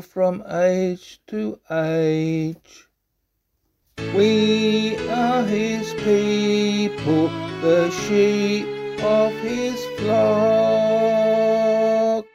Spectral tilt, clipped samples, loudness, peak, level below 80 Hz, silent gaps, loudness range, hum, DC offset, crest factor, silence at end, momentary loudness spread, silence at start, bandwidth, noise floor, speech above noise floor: -6 dB/octave; under 0.1%; -20 LUFS; -6 dBFS; -56 dBFS; none; 5 LU; none; under 0.1%; 14 dB; 0.1 s; 8 LU; 0 s; 15 kHz; -73 dBFS; 54 dB